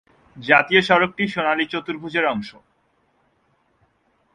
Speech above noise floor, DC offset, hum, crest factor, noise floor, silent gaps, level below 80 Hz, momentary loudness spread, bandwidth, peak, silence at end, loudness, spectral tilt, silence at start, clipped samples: 45 dB; under 0.1%; none; 22 dB; -65 dBFS; none; -60 dBFS; 14 LU; 10.5 kHz; 0 dBFS; 1.85 s; -19 LUFS; -5.5 dB/octave; 0.35 s; under 0.1%